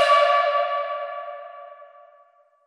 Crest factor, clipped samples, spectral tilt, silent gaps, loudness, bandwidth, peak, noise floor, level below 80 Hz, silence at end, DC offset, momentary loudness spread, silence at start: 18 dB; under 0.1%; 3.5 dB/octave; none; -21 LUFS; 11.5 kHz; -6 dBFS; -58 dBFS; under -90 dBFS; 0.8 s; under 0.1%; 24 LU; 0 s